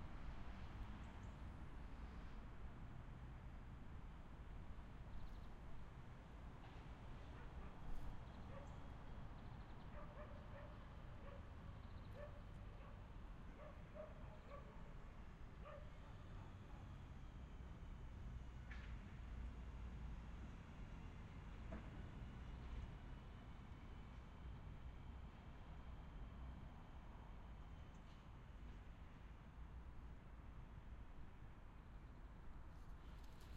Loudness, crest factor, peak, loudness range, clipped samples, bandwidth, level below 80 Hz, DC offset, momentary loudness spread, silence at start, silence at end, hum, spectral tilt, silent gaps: -59 LUFS; 18 dB; -38 dBFS; 4 LU; under 0.1%; 9.4 kHz; -58 dBFS; under 0.1%; 5 LU; 0 s; 0 s; none; -7 dB/octave; none